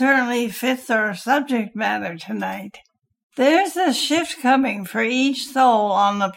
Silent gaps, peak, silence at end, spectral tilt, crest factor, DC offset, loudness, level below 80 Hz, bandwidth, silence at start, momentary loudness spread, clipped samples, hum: 3.23-3.30 s; -4 dBFS; 0 s; -3.5 dB/octave; 16 dB; under 0.1%; -20 LUFS; -68 dBFS; 16.5 kHz; 0 s; 10 LU; under 0.1%; none